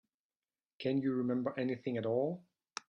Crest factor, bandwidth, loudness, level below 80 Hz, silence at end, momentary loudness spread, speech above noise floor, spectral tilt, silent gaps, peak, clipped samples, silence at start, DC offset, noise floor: 16 dB; 10 kHz; -36 LUFS; -80 dBFS; 0.5 s; 8 LU; over 55 dB; -7 dB/octave; none; -20 dBFS; under 0.1%; 0.8 s; under 0.1%; under -90 dBFS